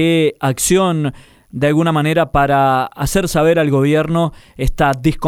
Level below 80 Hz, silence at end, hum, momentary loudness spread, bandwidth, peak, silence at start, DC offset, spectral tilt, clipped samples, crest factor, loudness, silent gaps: -30 dBFS; 0 s; none; 8 LU; 17 kHz; -2 dBFS; 0 s; under 0.1%; -5.5 dB/octave; under 0.1%; 12 dB; -15 LUFS; none